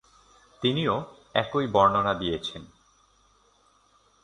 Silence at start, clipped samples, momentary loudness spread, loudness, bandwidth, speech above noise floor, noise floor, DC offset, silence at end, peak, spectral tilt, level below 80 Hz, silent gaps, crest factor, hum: 0.6 s; under 0.1%; 11 LU; -26 LUFS; 10.5 kHz; 38 dB; -63 dBFS; under 0.1%; 1.55 s; -6 dBFS; -6 dB/octave; -56 dBFS; none; 22 dB; none